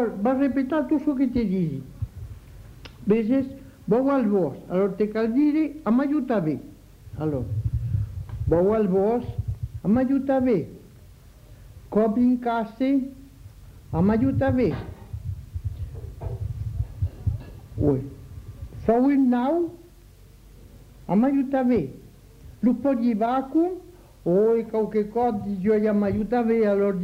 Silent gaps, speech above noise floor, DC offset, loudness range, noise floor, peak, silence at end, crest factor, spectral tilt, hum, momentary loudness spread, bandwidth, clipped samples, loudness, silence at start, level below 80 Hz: none; 27 dB; under 0.1%; 3 LU; -49 dBFS; -8 dBFS; 0 s; 16 dB; -9.5 dB/octave; none; 15 LU; 15 kHz; under 0.1%; -24 LUFS; 0 s; -42 dBFS